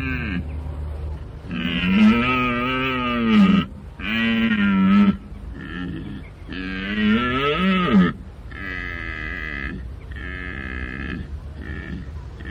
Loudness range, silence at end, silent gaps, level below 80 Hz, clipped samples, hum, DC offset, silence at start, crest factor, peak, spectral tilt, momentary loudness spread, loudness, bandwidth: 11 LU; 0 s; none; -36 dBFS; under 0.1%; none; under 0.1%; 0 s; 14 dB; -8 dBFS; -7.5 dB/octave; 18 LU; -21 LUFS; 6.4 kHz